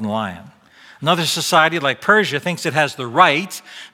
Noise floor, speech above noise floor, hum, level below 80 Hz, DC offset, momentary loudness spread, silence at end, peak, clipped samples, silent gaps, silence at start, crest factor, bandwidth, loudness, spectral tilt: -47 dBFS; 29 dB; none; -62 dBFS; under 0.1%; 10 LU; 0.05 s; 0 dBFS; under 0.1%; none; 0 s; 18 dB; 17 kHz; -16 LUFS; -3.5 dB/octave